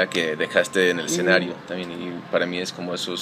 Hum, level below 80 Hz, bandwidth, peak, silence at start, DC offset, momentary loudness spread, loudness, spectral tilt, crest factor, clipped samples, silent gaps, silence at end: none; -68 dBFS; 15.5 kHz; -2 dBFS; 0 s; under 0.1%; 12 LU; -23 LUFS; -3.5 dB/octave; 20 dB; under 0.1%; none; 0 s